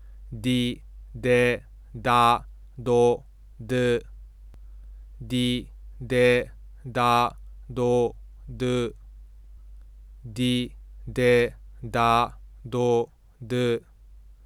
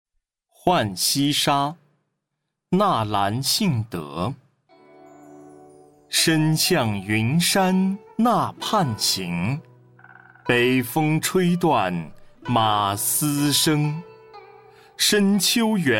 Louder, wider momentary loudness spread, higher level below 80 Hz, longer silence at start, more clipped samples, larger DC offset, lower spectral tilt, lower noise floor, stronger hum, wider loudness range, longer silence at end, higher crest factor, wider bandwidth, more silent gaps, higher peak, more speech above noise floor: second, -25 LUFS vs -21 LUFS; first, 21 LU vs 10 LU; first, -44 dBFS vs -58 dBFS; second, 0 s vs 0.65 s; neither; neither; first, -6 dB/octave vs -4 dB/octave; second, -49 dBFS vs -80 dBFS; neither; about the same, 5 LU vs 4 LU; first, 0.3 s vs 0 s; about the same, 20 dB vs 16 dB; second, 14 kHz vs 17 kHz; neither; about the same, -6 dBFS vs -6 dBFS; second, 26 dB vs 59 dB